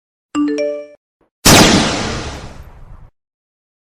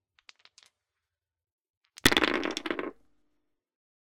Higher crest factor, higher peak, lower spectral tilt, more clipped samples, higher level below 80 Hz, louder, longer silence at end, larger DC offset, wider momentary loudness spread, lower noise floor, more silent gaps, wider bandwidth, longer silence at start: second, 16 dB vs 28 dB; first, 0 dBFS vs -6 dBFS; about the same, -3 dB/octave vs -2.5 dB/octave; first, 0.3% vs under 0.1%; first, -32 dBFS vs -54 dBFS; first, -12 LUFS vs -27 LUFS; second, 0.8 s vs 1.1 s; neither; first, 21 LU vs 13 LU; second, -37 dBFS vs -88 dBFS; first, 0.97-1.20 s, 1.31-1.42 s vs none; first, over 20 kHz vs 16.5 kHz; second, 0.35 s vs 2.05 s